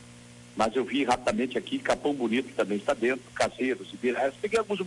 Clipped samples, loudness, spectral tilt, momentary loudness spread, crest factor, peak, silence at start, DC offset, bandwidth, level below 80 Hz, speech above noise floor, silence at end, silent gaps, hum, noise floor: under 0.1%; -28 LUFS; -4.5 dB/octave; 4 LU; 16 dB; -14 dBFS; 0 s; under 0.1%; 11.5 kHz; -60 dBFS; 21 dB; 0 s; none; none; -49 dBFS